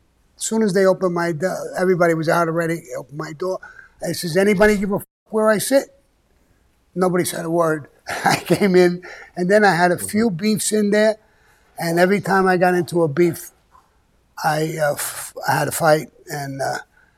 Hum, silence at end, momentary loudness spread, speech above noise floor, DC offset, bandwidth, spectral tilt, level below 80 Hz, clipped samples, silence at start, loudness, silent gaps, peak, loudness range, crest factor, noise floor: none; 0.35 s; 14 LU; 41 dB; under 0.1%; 16.5 kHz; -5 dB/octave; -50 dBFS; under 0.1%; 0.4 s; -19 LUFS; 5.11-5.26 s; -2 dBFS; 4 LU; 18 dB; -60 dBFS